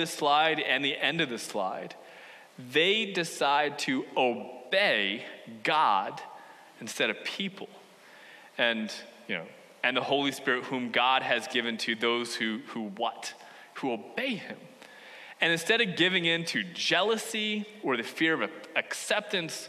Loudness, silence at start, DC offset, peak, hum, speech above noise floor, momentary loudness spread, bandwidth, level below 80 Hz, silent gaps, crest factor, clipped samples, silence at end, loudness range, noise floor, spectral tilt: -28 LUFS; 0 s; under 0.1%; -8 dBFS; none; 24 dB; 19 LU; 13.5 kHz; -84 dBFS; none; 22 dB; under 0.1%; 0 s; 6 LU; -53 dBFS; -3 dB/octave